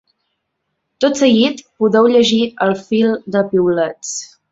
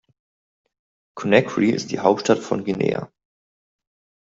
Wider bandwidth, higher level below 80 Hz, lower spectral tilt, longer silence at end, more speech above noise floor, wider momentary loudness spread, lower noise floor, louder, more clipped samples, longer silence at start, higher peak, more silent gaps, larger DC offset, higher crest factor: about the same, 8 kHz vs 7.8 kHz; about the same, -58 dBFS vs -62 dBFS; about the same, -4.5 dB/octave vs -5.5 dB/octave; second, 0.25 s vs 1.15 s; second, 58 dB vs over 70 dB; second, 8 LU vs 12 LU; second, -72 dBFS vs under -90 dBFS; first, -15 LUFS vs -21 LUFS; neither; second, 1 s vs 1.15 s; about the same, -2 dBFS vs 0 dBFS; neither; neither; second, 14 dB vs 22 dB